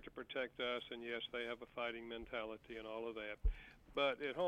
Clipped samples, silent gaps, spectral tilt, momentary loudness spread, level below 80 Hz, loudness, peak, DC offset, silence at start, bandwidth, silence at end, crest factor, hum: under 0.1%; none; -6 dB/octave; 10 LU; -52 dBFS; -44 LUFS; -26 dBFS; under 0.1%; 0 s; 9.4 kHz; 0 s; 18 dB; none